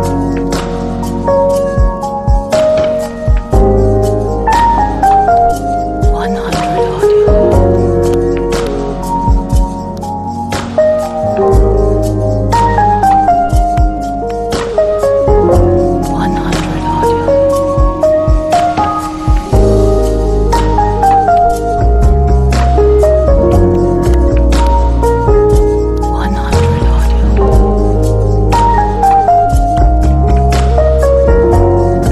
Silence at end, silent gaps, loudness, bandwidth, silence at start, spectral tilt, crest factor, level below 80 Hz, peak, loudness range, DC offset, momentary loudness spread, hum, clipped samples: 0 s; none; -11 LUFS; 13 kHz; 0 s; -7.5 dB/octave; 10 dB; -14 dBFS; 0 dBFS; 3 LU; under 0.1%; 6 LU; none; under 0.1%